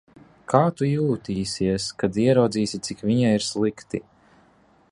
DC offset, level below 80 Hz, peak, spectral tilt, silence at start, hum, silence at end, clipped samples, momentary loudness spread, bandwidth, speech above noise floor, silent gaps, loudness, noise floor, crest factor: under 0.1%; -54 dBFS; -2 dBFS; -6 dB/octave; 0.5 s; none; 0.9 s; under 0.1%; 10 LU; 11.5 kHz; 36 dB; none; -23 LUFS; -58 dBFS; 22 dB